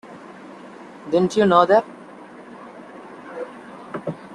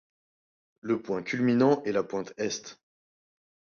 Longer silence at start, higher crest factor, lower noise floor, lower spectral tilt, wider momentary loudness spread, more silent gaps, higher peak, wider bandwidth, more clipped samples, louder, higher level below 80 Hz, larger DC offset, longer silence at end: second, 0.05 s vs 0.85 s; about the same, 22 dB vs 20 dB; second, -41 dBFS vs under -90 dBFS; about the same, -6 dB/octave vs -5.5 dB/octave; first, 25 LU vs 13 LU; neither; first, -2 dBFS vs -10 dBFS; first, 11.5 kHz vs 7 kHz; neither; first, -18 LUFS vs -28 LUFS; first, -66 dBFS vs -72 dBFS; neither; second, 0 s vs 1.05 s